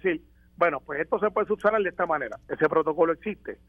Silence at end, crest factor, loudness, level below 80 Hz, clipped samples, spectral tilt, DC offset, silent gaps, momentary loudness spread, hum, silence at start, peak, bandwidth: 0.15 s; 18 dB; -26 LUFS; -58 dBFS; under 0.1%; -7.5 dB/octave; under 0.1%; none; 8 LU; none; 0.05 s; -8 dBFS; 6.2 kHz